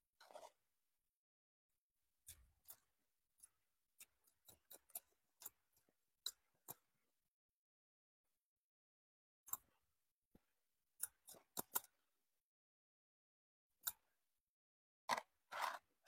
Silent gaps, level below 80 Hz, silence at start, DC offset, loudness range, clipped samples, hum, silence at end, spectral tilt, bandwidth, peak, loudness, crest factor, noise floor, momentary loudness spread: 1.10-1.69 s, 1.78-1.95 s, 7.28-8.24 s, 8.38-9.44 s, 10.11-10.31 s, 12.41-13.70 s, 14.40-15.08 s; -90 dBFS; 0.2 s; under 0.1%; 15 LU; under 0.1%; none; 0.3 s; 0 dB/octave; 16.5 kHz; -22 dBFS; -50 LUFS; 36 dB; under -90 dBFS; 21 LU